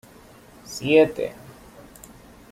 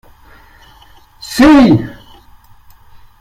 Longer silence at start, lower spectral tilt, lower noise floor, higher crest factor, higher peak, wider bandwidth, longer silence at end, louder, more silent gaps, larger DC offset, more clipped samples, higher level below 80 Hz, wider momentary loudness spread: second, 0.7 s vs 1.25 s; about the same, -5 dB/octave vs -6 dB/octave; first, -49 dBFS vs -43 dBFS; first, 20 dB vs 14 dB; second, -4 dBFS vs 0 dBFS; about the same, 15.5 kHz vs 15 kHz; about the same, 1.2 s vs 1.3 s; second, -21 LUFS vs -9 LUFS; neither; neither; neither; second, -56 dBFS vs -36 dBFS; first, 27 LU vs 23 LU